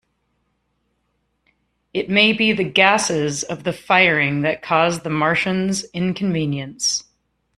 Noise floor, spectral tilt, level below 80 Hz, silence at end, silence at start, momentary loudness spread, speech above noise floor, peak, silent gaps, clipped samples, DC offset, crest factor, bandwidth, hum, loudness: -70 dBFS; -3.5 dB/octave; -56 dBFS; 0.55 s; 1.95 s; 11 LU; 51 dB; -2 dBFS; none; under 0.1%; under 0.1%; 20 dB; 13 kHz; none; -18 LUFS